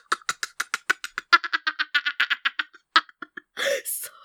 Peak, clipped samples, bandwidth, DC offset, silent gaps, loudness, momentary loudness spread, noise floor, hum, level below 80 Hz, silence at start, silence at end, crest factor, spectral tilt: 0 dBFS; under 0.1%; over 20 kHz; under 0.1%; none; -24 LUFS; 10 LU; -43 dBFS; none; -78 dBFS; 0.1 s; 0.15 s; 26 dB; 1.5 dB/octave